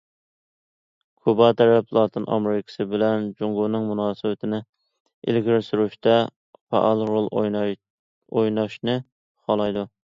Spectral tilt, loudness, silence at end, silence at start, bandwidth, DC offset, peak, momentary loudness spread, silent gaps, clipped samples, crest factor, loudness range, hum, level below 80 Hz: -8 dB/octave; -22 LUFS; 0.2 s; 1.25 s; 7.2 kHz; under 0.1%; -4 dBFS; 10 LU; 4.69-4.73 s, 5.00-5.05 s, 5.14-5.22 s, 6.36-6.53 s, 6.61-6.67 s, 7.90-8.21 s, 9.12-9.35 s; under 0.1%; 20 dB; 3 LU; none; -64 dBFS